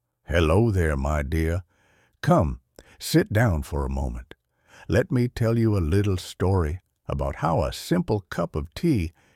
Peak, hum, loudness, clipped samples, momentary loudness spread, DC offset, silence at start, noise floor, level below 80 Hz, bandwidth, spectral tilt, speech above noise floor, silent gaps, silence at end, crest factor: -6 dBFS; none; -24 LUFS; under 0.1%; 9 LU; under 0.1%; 0.3 s; -63 dBFS; -34 dBFS; 16 kHz; -7 dB/octave; 40 dB; none; 0.25 s; 18 dB